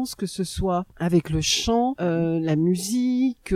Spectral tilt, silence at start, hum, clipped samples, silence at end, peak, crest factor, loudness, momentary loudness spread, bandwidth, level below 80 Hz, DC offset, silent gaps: -5 dB/octave; 0 s; none; under 0.1%; 0 s; -8 dBFS; 14 dB; -23 LUFS; 6 LU; 15.5 kHz; -42 dBFS; under 0.1%; none